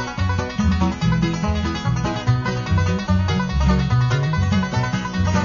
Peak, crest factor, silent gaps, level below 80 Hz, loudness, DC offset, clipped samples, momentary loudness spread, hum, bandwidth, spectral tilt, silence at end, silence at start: -6 dBFS; 14 dB; none; -28 dBFS; -20 LUFS; under 0.1%; under 0.1%; 4 LU; none; 7.2 kHz; -6.5 dB/octave; 0 s; 0 s